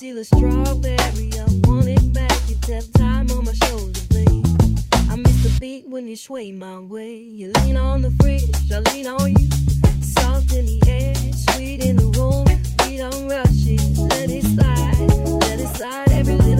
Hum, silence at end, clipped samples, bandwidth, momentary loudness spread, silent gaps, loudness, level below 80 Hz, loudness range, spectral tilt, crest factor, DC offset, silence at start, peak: none; 0 s; under 0.1%; 16 kHz; 10 LU; none; -18 LUFS; -20 dBFS; 3 LU; -6 dB/octave; 16 dB; under 0.1%; 0 s; -2 dBFS